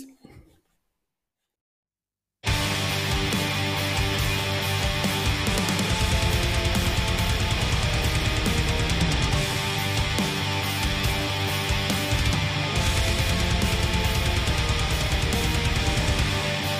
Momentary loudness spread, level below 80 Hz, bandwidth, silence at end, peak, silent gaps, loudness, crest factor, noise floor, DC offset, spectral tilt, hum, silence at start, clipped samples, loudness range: 2 LU; -30 dBFS; 16 kHz; 0 s; -10 dBFS; 1.61-1.83 s; -24 LUFS; 14 dB; under -90 dBFS; under 0.1%; -4 dB/octave; none; 0 s; under 0.1%; 3 LU